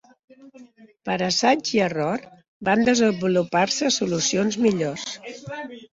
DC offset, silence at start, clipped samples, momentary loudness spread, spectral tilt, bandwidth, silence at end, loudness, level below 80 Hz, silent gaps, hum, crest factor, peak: under 0.1%; 0.4 s; under 0.1%; 15 LU; -4 dB/octave; 7.8 kHz; 0.1 s; -22 LUFS; -60 dBFS; 2.48-2.60 s; none; 18 dB; -6 dBFS